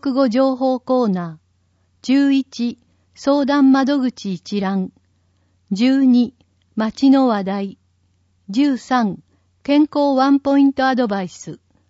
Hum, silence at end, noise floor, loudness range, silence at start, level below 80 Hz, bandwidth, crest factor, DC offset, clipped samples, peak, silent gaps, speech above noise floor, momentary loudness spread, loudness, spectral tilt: none; 0.35 s; -62 dBFS; 2 LU; 0 s; -62 dBFS; 7.8 kHz; 14 dB; under 0.1%; under 0.1%; -4 dBFS; none; 45 dB; 15 LU; -17 LUFS; -6.5 dB/octave